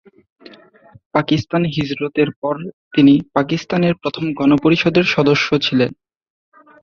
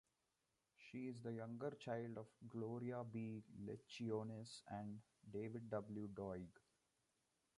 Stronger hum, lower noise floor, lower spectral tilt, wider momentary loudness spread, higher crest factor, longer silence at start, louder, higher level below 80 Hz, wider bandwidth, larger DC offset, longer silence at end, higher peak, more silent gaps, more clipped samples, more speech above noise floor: neither; second, -47 dBFS vs -89 dBFS; about the same, -6.5 dB/octave vs -7 dB/octave; about the same, 9 LU vs 7 LU; about the same, 16 dB vs 18 dB; first, 1.15 s vs 0.8 s; first, -16 LUFS vs -51 LUFS; first, -52 dBFS vs -80 dBFS; second, 6.8 kHz vs 11 kHz; neither; second, 0.9 s vs 1.05 s; first, -2 dBFS vs -32 dBFS; first, 2.36-2.42 s, 2.73-2.91 s vs none; neither; second, 31 dB vs 39 dB